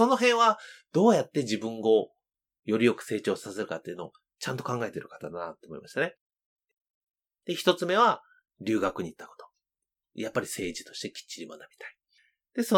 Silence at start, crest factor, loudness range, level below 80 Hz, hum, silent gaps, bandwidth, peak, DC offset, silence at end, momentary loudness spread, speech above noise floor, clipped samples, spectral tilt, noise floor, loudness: 0 s; 22 dB; 9 LU; -72 dBFS; none; 6.21-6.30 s, 6.46-6.57 s, 6.73-7.07 s; 18.5 kHz; -6 dBFS; under 0.1%; 0 s; 21 LU; 62 dB; under 0.1%; -4.5 dB/octave; -90 dBFS; -28 LUFS